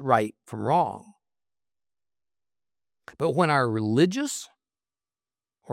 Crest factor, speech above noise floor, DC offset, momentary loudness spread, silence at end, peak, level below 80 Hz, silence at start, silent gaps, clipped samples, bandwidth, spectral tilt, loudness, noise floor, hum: 22 dB; over 66 dB; under 0.1%; 12 LU; 0 s; -6 dBFS; -72 dBFS; 0 s; none; under 0.1%; 16 kHz; -5.5 dB/octave; -25 LUFS; under -90 dBFS; none